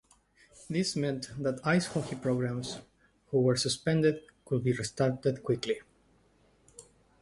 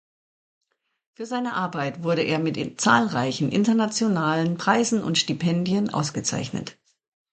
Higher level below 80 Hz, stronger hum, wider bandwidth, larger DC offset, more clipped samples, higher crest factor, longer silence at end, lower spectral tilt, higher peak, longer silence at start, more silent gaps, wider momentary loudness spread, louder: about the same, -62 dBFS vs -64 dBFS; neither; first, 11.5 kHz vs 9.2 kHz; neither; neither; about the same, 18 dB vs 20 dB; second, 0.4 s vs 0.6 s; about the same, -5.5 dB/octave vs -4.5 dB/octave; second, -14 dBFS vs -4 dBFS; second, 0.55 s vs 1.2 s; neither; about the same, 8 LU vs 9 LU; second, -31 LUFS vs -23 LUFS